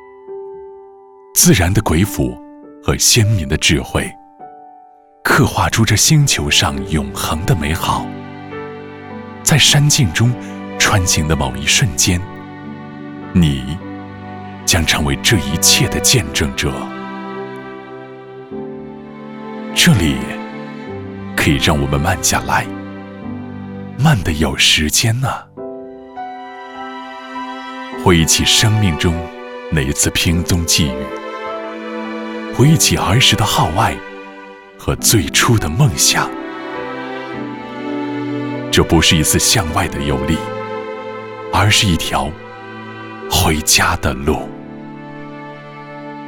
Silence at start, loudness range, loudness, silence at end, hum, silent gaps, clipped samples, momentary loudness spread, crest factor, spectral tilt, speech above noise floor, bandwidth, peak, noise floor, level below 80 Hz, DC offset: 0 s; 4 LU; -14 LUFS; 0 s; none; none; under 0.1%; 20 LU; 16 dB; -3.5 dB/octave; 30 dB; over 20 kHz; 0 dBFS; -44 dBFS; -32 dBFS; under 0.1%